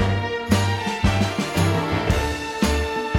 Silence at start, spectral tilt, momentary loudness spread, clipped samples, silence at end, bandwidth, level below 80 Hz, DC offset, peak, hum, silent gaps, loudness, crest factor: 0 s; -5.5 dB/octave; 3 LU; under 0.1%; 0 s; 16.5 kHz; -32 dBFS; under 0.1%; -6 dBFS; none; none; -22 LUFS; 14 dB